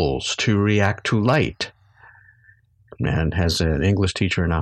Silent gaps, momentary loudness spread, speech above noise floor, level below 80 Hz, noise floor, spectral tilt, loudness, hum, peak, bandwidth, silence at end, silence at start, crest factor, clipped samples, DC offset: none; 7 LU; 35 dB; -36 dBFS; -55 dBFS; -5.5 dB/octave; -21 LUFS; none; -4 dBFS; 12.5 kHz; 0 s; 0 s; 18 dB; under 0.1%; under 0.1%